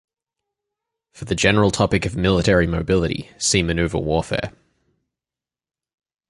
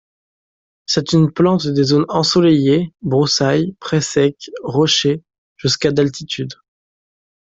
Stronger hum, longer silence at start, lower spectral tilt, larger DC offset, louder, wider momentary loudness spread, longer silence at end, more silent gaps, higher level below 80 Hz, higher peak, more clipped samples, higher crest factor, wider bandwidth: neither; first, 1.15 s vs 0.9 s; about the same, -4.5 dB/octave vs -5 dB/octave; neither; second, -19 LUFS vs -16 LUFS; about the same, 10 LU vs 11 LU; first, 1.8 s vs 1.05 s; second, none vs 5.38-5.56 s; first, -36 dBFS vs -52 dBFS; about the same, -2 dBFS vs -2 dBFS; neither; first, 20 dB vs 14 dB; first, 11.5 kHz vs 8 kHz